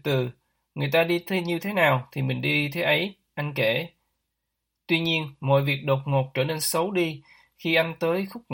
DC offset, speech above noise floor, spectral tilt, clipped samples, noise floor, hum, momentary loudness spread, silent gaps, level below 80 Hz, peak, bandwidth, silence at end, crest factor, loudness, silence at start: under 0.1%; 56 dB; -5 dB/octave; under 0.1%; -81 dBFS; none; 9 LU; none; -66 dBFS; -6 dBFS; 17 kHz; 0 s; 20 dB; -25 LUFS; 0.05 s